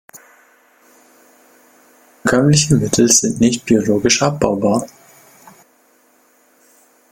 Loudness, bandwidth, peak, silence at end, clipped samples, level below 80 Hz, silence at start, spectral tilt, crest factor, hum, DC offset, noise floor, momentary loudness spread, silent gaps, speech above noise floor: -14 LUFS; 17 kHz; 0 dBFS; 2.25 s; under 0.1%; -48 dBFS; 0.15 s; -4 dB/octave; 18 dB; none; under 0.1%; -55 dBFS; 7 LU; none; 40 dB